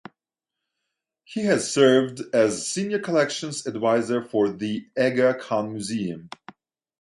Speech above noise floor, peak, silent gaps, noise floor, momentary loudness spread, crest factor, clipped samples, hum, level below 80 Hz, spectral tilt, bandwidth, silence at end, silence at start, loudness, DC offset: 64 dB; -4 dBFS; none; -87 dBFS; 12 LU; 20 dB; under 0.1%; none; -68 dBFS; -4.5 dB/octave; 11.5 kHz; 0.75 s; 1.3 s; -23 LUFS; under 0.1%